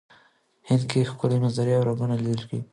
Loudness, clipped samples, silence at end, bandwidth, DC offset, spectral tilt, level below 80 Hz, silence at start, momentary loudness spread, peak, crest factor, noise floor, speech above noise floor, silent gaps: -24 LUFS; under 0.1%; 0.1 s; 11 kHz; under 0.1%; -7.5 dB/octave; -62 dBFS; 0.65 s; 4 LU; -8 dBFS; 16 dB; -61 dBFS; 37 dB; none